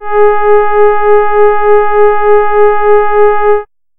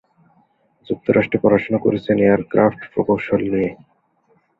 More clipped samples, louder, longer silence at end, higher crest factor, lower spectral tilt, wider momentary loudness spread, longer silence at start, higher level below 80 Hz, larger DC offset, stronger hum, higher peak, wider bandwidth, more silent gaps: neither; first, -8 LUFS vs -18 LUFS; second, 0.35 s vs 0.85 s; second, 6 dB vs 18 dB; about the same, -9.5 dB/octave vs -10 dB/octave; second, 2 LU vs 8 LU; second, 0 s vs 0.9 s; first, -34 dBFS vs -52 dBFS; neither; neither; about the same, 0 dBFS vs -2 dBFS; second, 3.5 kHz vs 5.2 kHz; neither